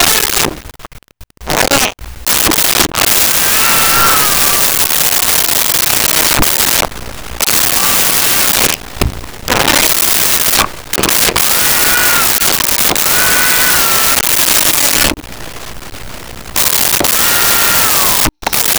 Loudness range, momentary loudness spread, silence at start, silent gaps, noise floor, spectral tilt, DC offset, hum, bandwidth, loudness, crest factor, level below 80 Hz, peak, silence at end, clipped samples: 3 LU; 11 LU; 0 s; none; -36 dBFS; -0.5 dB/octave; under 0.1%; none; over 20 kHz; -8 LUFS; 12 dB; -32 dBFS; 0 dBFS; 0 s; under 0.1%